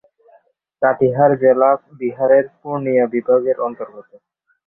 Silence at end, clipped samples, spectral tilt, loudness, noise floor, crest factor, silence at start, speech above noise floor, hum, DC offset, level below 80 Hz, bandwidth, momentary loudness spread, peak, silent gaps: 0.65 s; under 0.1%; -12.5 dB/octave; -16 LUFS; -55 dBFS; 16 dB; 0.8 s; 39 dB; none; under 0.1%; -62 dBFS; 3 kHz; 12 LU; -2 dBFS; none